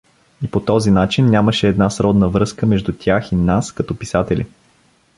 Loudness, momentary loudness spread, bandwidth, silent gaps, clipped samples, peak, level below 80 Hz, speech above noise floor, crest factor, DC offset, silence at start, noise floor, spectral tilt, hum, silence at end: -16 LUFS; 9 LU; 11.5 kHz; none; under 0.1%; -2 dBFS; -36 dBFS; 40 dB; 16 dB; under 0.1%; 0.4 s; -55 dBFS; -6.5 dB/octave; none; 0.7 s